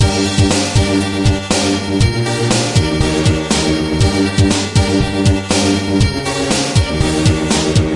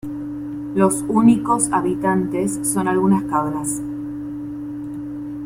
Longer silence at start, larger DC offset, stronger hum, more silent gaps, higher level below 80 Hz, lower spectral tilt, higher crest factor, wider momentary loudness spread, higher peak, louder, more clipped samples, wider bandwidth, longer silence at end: about the same, 0 s vs 0.05 s; neither; neither; neither; first, -26 dBFS vs -50 dBFS; about the same, -5 dB/octave vs -6 dB/octave; second, 12 dB vs 18 dB; second, 2 LU vs 14 LU; about the same, 0 dBFS vs -2 dBFS; first, -14 LUFS vs -20 LUFS; neither; second, 11.5 kHz vs 16 kHz; about the same, 0 s vs 0 s